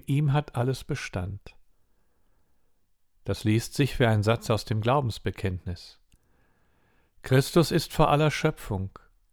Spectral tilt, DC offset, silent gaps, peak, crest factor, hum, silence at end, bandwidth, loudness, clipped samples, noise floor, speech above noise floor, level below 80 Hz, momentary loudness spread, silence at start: -6 dB/octave; under 0.1%; none; -8 dBFS; 20 dB; none; 0.45 s; 19.5 kHz; -26 LUFS; under 0.1%; -65 dBFS; 39 dB; -46 dBFS; 15 LU; 0.1 s